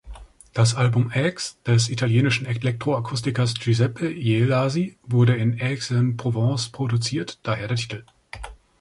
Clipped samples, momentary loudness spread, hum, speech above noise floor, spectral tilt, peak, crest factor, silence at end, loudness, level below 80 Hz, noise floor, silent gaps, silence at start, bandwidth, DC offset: under 0.1%; 10 LU; none; 20 dB; -5.5 dB/octave; -6 dBFS; 16 dB; 0.25 s; -22 LUFS; -50 dBFS; -42 dBFS; none; 0.05 s; 11.5 kHz; under 0.1%